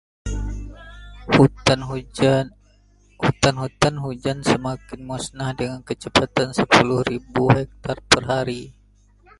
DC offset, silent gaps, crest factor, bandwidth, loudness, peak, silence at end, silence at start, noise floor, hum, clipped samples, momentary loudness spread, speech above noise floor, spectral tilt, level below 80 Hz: under 0.1%; none; 22 dB; 11.5 kHz; -20 LUFS; 0 dBFS; 0.7 s; 0.25 s; -55 dBFS; 50 Hz at -45 dBFS; under 0.1%; 16 LU; 34 dB; -5 dB/octave; -38 dBFS